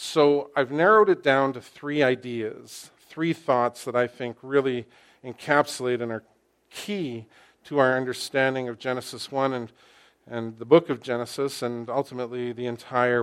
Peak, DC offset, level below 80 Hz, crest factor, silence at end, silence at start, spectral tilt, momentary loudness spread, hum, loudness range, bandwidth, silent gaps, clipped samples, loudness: -4 dBFS; under 0.1%; -72 dBFS; 22 dB; 0 s; 0 s; -5 dB/octave; 17 LU; none; 5 LU; 15.5 kHz; none; under 0.1%; -25 LUFS